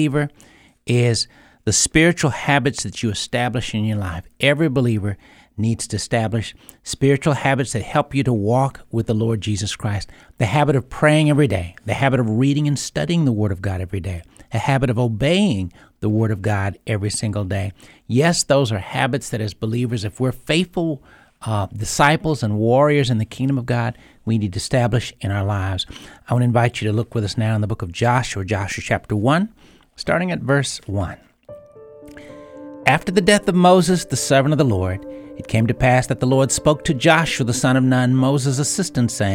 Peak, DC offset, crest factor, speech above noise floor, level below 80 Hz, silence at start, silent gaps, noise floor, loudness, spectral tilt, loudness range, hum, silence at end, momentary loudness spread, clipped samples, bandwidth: 0 dBFS; under 0.1%; 18 dB; 23 dB; -44 dBFS; 0 s; none; -42 dBFS; -19 LUFS; -5 dB/octave; 4 LU; none; 0 s; 11 LU; under 0.1%; 16 kHz